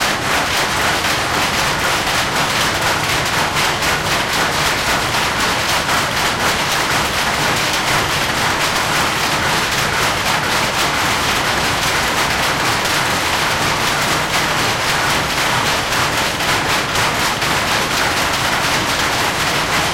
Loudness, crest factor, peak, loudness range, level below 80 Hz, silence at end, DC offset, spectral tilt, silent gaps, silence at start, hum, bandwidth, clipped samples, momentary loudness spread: -15 LUFS; 12 dB; -4 dBFS; 0 LU; -36 dBFS; 0 s; under 0.1%; -2 dB/octave; none; 0 s; none; 17 kHz; under 0.1%; 1 LU